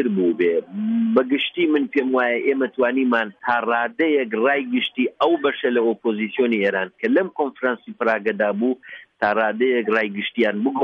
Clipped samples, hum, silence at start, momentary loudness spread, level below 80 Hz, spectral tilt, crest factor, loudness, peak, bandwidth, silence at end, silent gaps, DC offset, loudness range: under 0.1%; none; 0 s; 5 LU; -70 dBFS; -7.5 dB/octave; 14 dB; -21 LUFS; -6 dBFS; 5.8 kHz; 0 s; none; under 0.1%; 2 LU